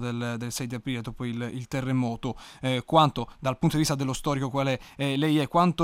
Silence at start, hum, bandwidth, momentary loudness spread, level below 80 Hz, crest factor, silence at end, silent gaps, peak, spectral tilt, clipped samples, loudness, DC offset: 0 s; none; 16.5 kHz; 11 LU; -50 dBFS; 20 dB; 0 s; none; -6 dBFS; -5.5 dB/octave; under 0.1%; -27 LUFS; under 0.1%